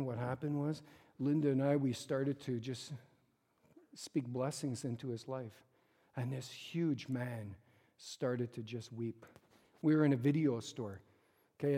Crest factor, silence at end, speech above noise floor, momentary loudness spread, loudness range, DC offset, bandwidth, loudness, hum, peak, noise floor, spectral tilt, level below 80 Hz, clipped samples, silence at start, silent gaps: 18 dB; 0 s; 38 dB; 18 LU; 6 LU; under 0.1%; 15 kHz; -38 LUFS; none; -20 dBFS; -76 dBFS; -7 dB/octave; -82 dBFS; under 0.1%; 0 s; none